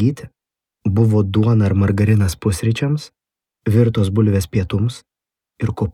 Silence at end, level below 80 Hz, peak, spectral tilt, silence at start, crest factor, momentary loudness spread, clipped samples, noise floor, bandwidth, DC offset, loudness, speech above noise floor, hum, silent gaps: 0 s; -44 dBFS; -2 dBFS; -7.5 dB/octave; 0 s; 14 dB; 10 LU; under 0.1%; -82 dBFS; 14 kHz; under 0.1%; -18 LUFS; 66 dB; none; none